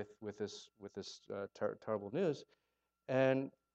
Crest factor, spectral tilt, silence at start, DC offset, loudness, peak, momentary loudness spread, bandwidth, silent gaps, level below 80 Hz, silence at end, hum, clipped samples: 20 dB; -6 dB/octave; 0 s; under 0.1%; -40 LUFS; -20 dBFS; 15 LU; 8.2 kHz; none; -84 dBFS; 0.25 s; none; under 0.1%